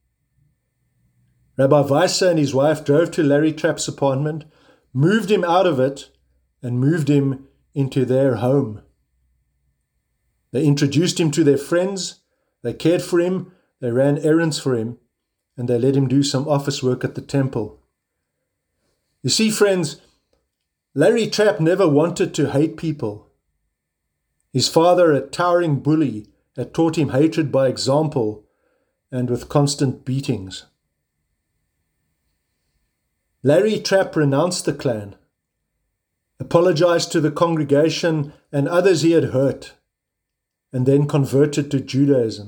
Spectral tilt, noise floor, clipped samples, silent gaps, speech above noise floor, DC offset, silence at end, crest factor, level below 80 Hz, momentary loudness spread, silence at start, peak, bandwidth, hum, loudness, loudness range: -6 dB/octave; -80 dBFS; under 0.1%; none; 62 dB; under 0.1%; 0 s; 20 dB; -58 dBFS; 13 LU; 1.6 s; 0 dBFS; over 20 kHz; none; -19 LUFS; 5 LU